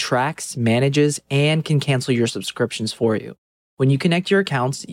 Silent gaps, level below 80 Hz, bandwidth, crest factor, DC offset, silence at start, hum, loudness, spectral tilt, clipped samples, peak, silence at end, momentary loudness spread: 3.38-3.77 s; -64 dBFS; 15 kHz; 16 dB; under 0.1%; 0 s; none; -20 LUFS; -5.5 dB/octave; under 0.1%; -4 dBFS; 0 s; 6 LU